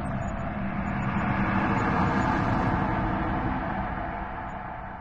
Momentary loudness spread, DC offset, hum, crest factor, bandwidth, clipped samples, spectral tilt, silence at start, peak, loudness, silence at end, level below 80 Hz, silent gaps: 10 LU; under 0.1%; none; 14 dB; 8.8 kHz; under 0.1%; -8 dB/octave; 0 s; -12 dBFS; -28 LUFS; 0 s; -38 dBFS; none